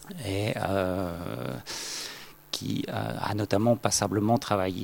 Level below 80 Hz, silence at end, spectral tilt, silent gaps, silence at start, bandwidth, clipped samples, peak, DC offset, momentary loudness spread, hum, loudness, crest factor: -60 dBFS; 0 s; -4.5 dB/octave; none; 0 s; 17 kHz; under 0.1%; -8 dBFS; under 0.1%; 10 LU; none; -29 LUFS; 22 dB